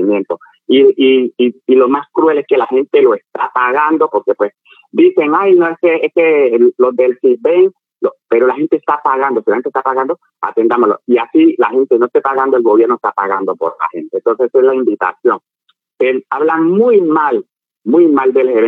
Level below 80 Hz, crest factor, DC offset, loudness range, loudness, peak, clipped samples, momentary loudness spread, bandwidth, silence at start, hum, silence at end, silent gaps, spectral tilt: -72 dBFS; 12 dB; under 0.1%; 3 LU; -12 LUFS; 0 dBFS; under 0.1%; 8 LU; 3.9 kHz; 0 s; none; 0 s; none; -8 dB/octave